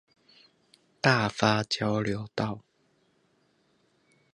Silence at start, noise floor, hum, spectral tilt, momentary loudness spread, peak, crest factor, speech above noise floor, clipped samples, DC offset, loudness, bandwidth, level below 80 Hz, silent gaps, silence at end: 1.05 s; -69 dBFS; none; -5 dB/octave; 9 LU; -6 dBFS; 26 dB; 42 dB; under 0.1%; under 0.1%; -27 LUFS; 11 kHz; -62 dBFS; none; 1.75 s